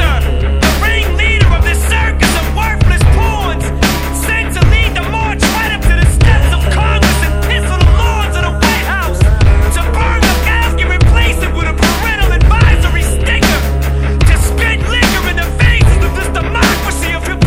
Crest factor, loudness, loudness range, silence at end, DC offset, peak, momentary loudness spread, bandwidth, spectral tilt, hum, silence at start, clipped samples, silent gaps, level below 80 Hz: 10 dB; -12 LUFS; 1 LU; 0 s; under 0.1%; 0 dBFS; 5 LU; 16.5 kHz; -5 dB/octave; none; 0 s; 0.8%; none; -12 dBFS